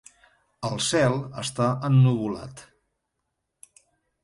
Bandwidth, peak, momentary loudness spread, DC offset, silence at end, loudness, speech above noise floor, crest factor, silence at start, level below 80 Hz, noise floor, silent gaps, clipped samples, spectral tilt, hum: 11.5 kHz; -10 dBFS; 14 LU; under 0.1%; 1.6 s; -24 LUFS; 57 dB; 16 dB; 0.6 s; -60 dBFS; -80 dBFS; none; under 0.1%; -5.5 dB/octave; none